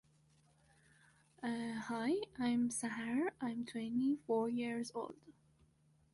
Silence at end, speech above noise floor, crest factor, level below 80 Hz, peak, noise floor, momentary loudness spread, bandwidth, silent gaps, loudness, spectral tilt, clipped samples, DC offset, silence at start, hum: 0.85 s; 33 dB; 16 dB; -76 dBFS; -26 dBFS; -72 dBFS; 7 LU; 11.5 kHz; none; -39 LUFS; -4.5 dB/octave; under 0.1%; under 0.1%; 1.4 s; none